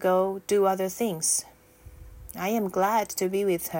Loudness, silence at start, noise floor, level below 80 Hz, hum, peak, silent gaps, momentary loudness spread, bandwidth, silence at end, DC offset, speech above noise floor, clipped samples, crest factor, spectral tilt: -26 LUFS; 0 s; -50 dBFS; -54 dBFS; none; -12 dBFS; none; 5 LU; 17 kHz; 0 s; under 0.1%; 25 dB; under 0.1%; 16 dB; -4 dB/octave